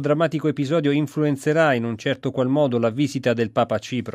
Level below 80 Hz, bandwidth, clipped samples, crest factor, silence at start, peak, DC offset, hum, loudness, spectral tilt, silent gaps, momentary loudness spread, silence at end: -64 dBFS; 14.5 kHz; under 0.1%; 16 dB; 0 s; -6 dBFS; under 0.1%; none; -21 LUFS; -6.5 dB/octave; none; 5 LU; 0.05 s